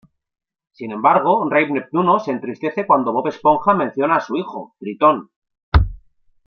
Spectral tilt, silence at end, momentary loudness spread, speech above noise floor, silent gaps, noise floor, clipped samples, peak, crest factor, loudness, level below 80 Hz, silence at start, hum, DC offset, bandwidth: -8 dB/octave; 0.5 s; 11 LU; 32 dB; 5.36-5.42 s, 5.63-5.72 s; -49 dBFS; under 0.1%; -2 dBFS; 16 dB; -18 LUFS; -30 dBFS; 0.8 s; none; under 0.1%; 6.6 kHz